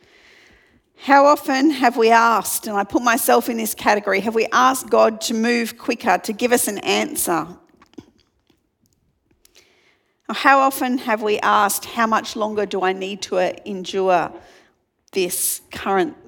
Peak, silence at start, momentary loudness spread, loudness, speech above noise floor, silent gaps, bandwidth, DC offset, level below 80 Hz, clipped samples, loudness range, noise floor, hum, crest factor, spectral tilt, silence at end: 0 dBFS; 1 s; 10 LU; -18 LUFS; 46 dB; none; 19 kHz; under 0.1%; -62 dBFS; under 0.1%; 7 LU; -65 dBFS; none; 20 dB; -3 dB/octave; 0.15 s